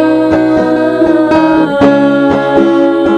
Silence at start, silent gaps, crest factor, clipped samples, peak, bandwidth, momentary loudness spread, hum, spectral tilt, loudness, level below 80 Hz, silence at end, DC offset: 0 s; none; 8 dB; 0.4%; 0 dBFS; 9 kHz; 2 LU; none; -7 dB/octave; -9 LUFS; -40 dBFS; 0 s; under 0.1%